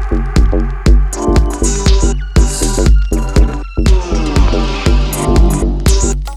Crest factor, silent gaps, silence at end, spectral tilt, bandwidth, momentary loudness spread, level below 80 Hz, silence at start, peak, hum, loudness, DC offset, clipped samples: 10 dB; none; 0 s; -5.5 dB/octave; 14 kHz; 3 LU; -12 dBFS; 0 s; 0 dBFS; none; -13 LUFS; under 0.1%; under 0.1%